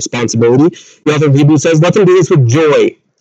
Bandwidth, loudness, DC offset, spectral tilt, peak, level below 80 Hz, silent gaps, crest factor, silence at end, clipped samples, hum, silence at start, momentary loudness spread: 8.2 kHz; -9 LUFS; under 0.1%; -6 dB/octave; 0 dBFS; -56 dBFS; none; 8 dB; 0.3 s; under 0.1%; none; 0 s; 7 LU